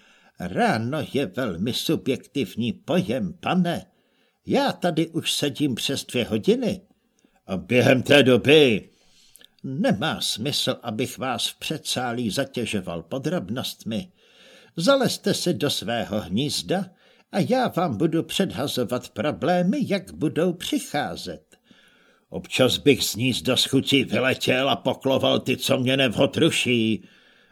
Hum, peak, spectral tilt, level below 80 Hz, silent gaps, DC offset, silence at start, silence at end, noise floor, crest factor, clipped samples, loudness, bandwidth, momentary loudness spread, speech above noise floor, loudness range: none; -2 dBFS; -4.5 dB/octave; -58 dBFS; none; under 0.1%; 0.4 s; 0.5 s; -65 dBFS; 22 dB; under 0.1%; -23 LUFS; 18.5 kHz; 10 LU; 42 dB; 6 LU